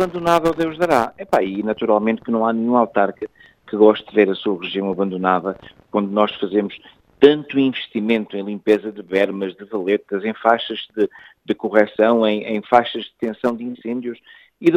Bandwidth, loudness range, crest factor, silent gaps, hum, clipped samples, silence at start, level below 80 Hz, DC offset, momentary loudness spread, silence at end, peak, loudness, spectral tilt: 15 kHz; 2 LU; 18 dB; none; none; under 0.1%; 0 s; -58 dBFS; under 0.1%; 11 LU; 0 s; 0 dBFS; -19 LUFS; -6.5 dB/octave